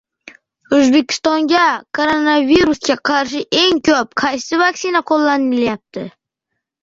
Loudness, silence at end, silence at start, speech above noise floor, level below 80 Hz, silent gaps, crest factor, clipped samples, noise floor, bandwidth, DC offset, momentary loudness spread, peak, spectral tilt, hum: -14 LUFS; 0.75 s; 0.7 s; 62 dB; -50 dBFS; none; 14 dB; under 0.1%; -77 dBFS; 7.8 kHz; under 0.1%; 6 LU; -2 dBFS; -3 dB/octave; none